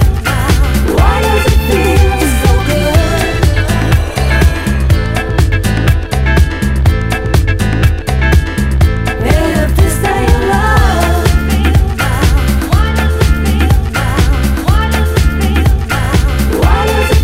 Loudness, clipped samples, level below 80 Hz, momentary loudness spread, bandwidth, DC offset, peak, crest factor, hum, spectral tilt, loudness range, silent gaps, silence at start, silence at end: -11 LUFS; 0.6%; -12 dBFS; 3 LU; 16.5 kHz; under 0.1%; 0 dBFS; 10 dB; none; -5.5 dB/octave; 1 LU; none; 0 s; 0 s